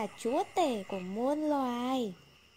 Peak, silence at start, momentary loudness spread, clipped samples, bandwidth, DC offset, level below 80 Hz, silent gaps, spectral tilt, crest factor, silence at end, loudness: -18 dBFS; 0 s; 6 LU; under 0.1%; 16 kHz; under 0.1%; -72 dBFS; none; -5 dB/octave; 16 dB; 0.4 s; -33 LUFS